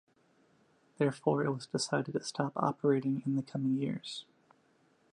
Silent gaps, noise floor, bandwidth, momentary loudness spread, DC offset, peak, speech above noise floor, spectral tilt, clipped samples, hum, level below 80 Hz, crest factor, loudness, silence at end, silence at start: none; -69 dBFS; 11 kHz; 6 LU; under 0.1%; -14 dBFS; 37 dB; -6 dB/octave; under 0.1%; none; -80 dBFS; 20 dB; -33 LUFS; 0.9 s; 1 s